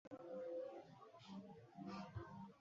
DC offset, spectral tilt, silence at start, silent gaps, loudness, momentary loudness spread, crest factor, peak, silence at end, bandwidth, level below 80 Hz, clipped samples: under 0.1%; -6.5 dB/octave; 0.05 s; 0.07-0.11 s; -54 LUFS; 10 LU; 14 dB; -40 dBFS; 0 s; 7.4 kHz; -74 dBFS; under 0.1%